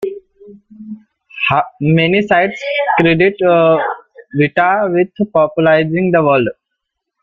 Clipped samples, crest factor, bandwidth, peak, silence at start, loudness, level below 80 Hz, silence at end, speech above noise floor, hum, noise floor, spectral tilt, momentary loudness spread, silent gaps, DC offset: under 0.1%; 14 dB; 7.2 kHz; 0 dBFS; 0 s; -13 LUFS; -50 dBFS; 0.7 s; 63 dB; none; -75 dBFS; -8 dB/octave; 14 LU; none; under 0.1%